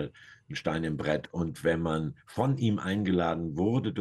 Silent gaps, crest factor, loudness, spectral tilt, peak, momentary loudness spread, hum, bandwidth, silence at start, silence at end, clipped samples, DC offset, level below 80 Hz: none; 16 dB; -30 LUFS; -7 dB/octave; -14 dBFS; 7 LU; none; 12.5 kHz; 0 s; 0 s; under 0.1%; under 0.1%; -54 dBFS